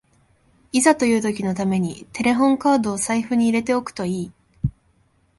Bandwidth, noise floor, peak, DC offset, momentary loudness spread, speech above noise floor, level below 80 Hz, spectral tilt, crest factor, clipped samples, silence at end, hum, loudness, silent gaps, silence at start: 11.5 kHz; -61 dBFS; -2 dBFS; under 0.1%; 11 LU; 42 dB; -48 dBFS; -5 dB/octave; 18 dB; under 0.1%; 0.7 s; none; -21 LUFS; none; 0.75 s